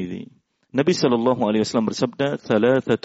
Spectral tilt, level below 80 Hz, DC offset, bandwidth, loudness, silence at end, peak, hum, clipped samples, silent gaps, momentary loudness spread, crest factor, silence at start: -5 dB/octave; -62 dBFS; under 0.1%; 8 kHz; -21 LUFS; 0.05 s; -6 dBFS; none; under 0.1%; none; 8 LU; 16 dB; 0 s